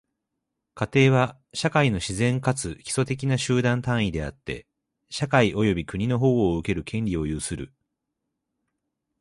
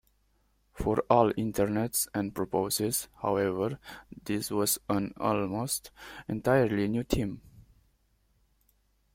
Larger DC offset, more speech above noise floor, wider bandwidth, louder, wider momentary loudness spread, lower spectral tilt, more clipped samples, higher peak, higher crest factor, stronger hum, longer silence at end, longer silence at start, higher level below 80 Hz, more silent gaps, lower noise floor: neither; first, 58 dB vs 41 dB; second, 11.5 kHz vs 16.5 kHz; first, -24 LUFS vs -29 LUFS; about the same, 12 LU vs 12 LU; about the same, -5.5 dB/octave vs -4.5 dB/octave; neither; first, -4 dBFS vs -8 dBFS; about the same, 20 dB vs 24 dB; neither; about the same, 1.55 s vs 1.55 s; about the same, 0.75 s vs 0.75 s; first, -46 dBFS vs -52 dBFS; neither; first, -82 dBFS vs -70 dBFS